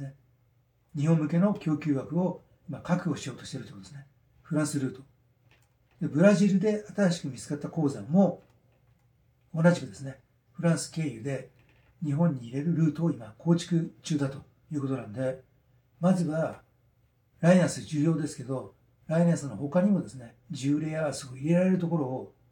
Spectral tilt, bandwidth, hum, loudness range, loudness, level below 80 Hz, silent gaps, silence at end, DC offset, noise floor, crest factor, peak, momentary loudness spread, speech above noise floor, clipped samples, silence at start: -7 dB/octave; 11.5 kHz; none; 5 LU; -28 LUFS; -68 dBFS; none; 0.25 s; under 0.1%; -67 dBFS; 20 dB; -8 dBFS; 16 LU; 40 dB; under 0.1%; 0 s